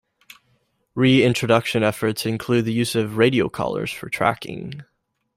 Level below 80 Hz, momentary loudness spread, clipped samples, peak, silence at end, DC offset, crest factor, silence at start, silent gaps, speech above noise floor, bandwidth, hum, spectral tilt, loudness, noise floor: -56 dBFS; 15 LU; under 0.1%; -4 dBFS; 0.55 s; under 0.1%; 18 dB; 0.95 s; none; 46 dB; 16 kHz; none; -5.5 dB/octave; -20 LUFS; -66 dBFS